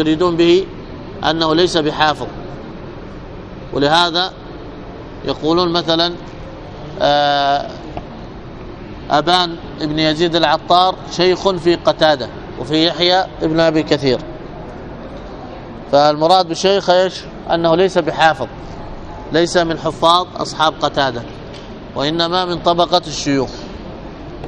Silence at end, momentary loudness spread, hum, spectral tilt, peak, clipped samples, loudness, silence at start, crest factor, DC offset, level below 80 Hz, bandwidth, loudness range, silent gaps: 0 s; 19 LU; none; -4.5 dB/octave; 0 dBFS; under 0.1%; -15 LUFS; 0 s; 16 dB; under 0.1%; -38 dBFS; 10 kHz; 4 LU; none